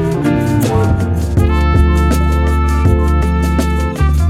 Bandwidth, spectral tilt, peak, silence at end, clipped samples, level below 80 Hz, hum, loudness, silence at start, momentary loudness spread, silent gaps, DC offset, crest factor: 14.5 kHz; -7.5 dB/octave; 0 dBFS; 0 s; under 0.1%; -14 dBFS; none; -13 LUFS; 0 s; 3 LU; none; under 0.1%; 12 dB